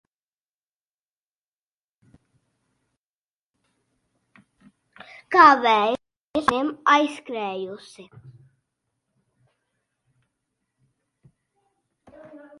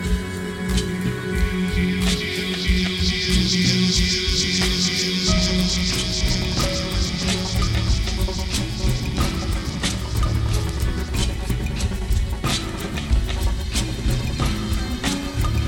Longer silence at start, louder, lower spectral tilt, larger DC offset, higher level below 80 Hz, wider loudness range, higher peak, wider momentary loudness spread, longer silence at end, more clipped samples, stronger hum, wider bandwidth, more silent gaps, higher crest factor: first, 5.3 s vs 0 s; about the same, -20 LUFS vs -22 LUFS; about the same, -4 dB/octave vs -4 dB/octave; neither; second, -64 dBFS vs -26 dBFS; first, 17 LU vs 5 LU; first, -2 dBFS vs -6 dBFS; first, 19 LU vs 6 LU; first, 0.25 s vs 0 s; neither; neither; second, 11.5 kHz vs 17.5 kHz; first, 6.17-6.34 s vs none; first, 24 dB vs 16 dB